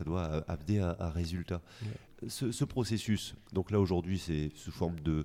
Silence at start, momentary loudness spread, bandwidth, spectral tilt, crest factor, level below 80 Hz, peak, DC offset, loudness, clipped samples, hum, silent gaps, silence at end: 0 s; 10 LU; 16 kHz; -6.5 dB/octave; 18 dB; -48 dBFS; -18 dBFS; under 0.1%; -35 LUFS; under 0.1%; none; none; 0 s